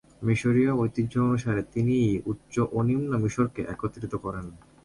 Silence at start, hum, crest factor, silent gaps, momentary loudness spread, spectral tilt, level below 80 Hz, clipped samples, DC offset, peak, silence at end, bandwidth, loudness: 0.2 s; none; 16 dB; none; 10 LU; -8 dB/octave; -50 dBFS; under 0.1%; under 0.1%; -10 dBFS; 0.25 s; 11.5 kHz; -27 LUFS